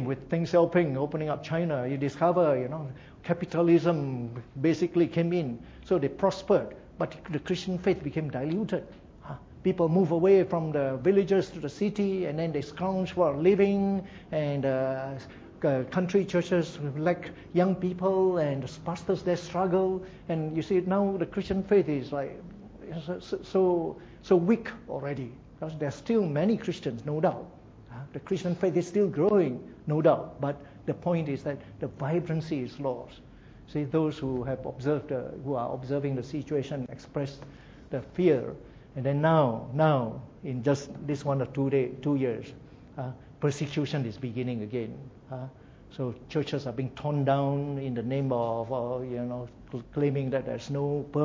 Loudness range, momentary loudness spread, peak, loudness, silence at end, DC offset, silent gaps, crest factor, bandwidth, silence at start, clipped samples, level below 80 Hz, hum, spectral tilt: 6 LU; 15 LU; -10 dBFS; -29 LUFS; 0 s; under 0.1%; none; 20 dB; 7.8 kHz; 0 s; under 0.1%; -56 dBFS; none; -8 dB/octave